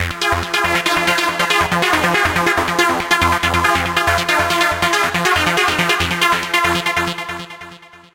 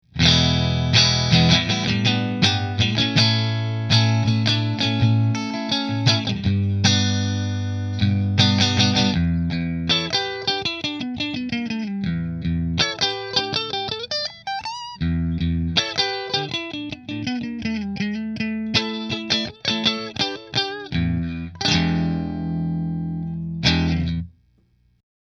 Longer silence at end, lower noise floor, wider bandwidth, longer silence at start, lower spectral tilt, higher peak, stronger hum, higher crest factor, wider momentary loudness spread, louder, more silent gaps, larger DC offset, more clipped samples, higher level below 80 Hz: second, 0.2 s vs 1 s; second, -39 dBFS vs -61 dBFS; first, 17 kHz vs 7.4 kHz; second, 0 s vs 0.15 s; second, -3 dB/octave vs -4.5 dB/octave; about the same, 0 dBFS vs 0 dBFS; neither; second, 16 dB vs 22 dB; second, 4 LU vs 10 LU; first, -15 LUFS vs -21 LUFS; neither; neither; neither; about the same, -38 dBFS vs -40 dBFS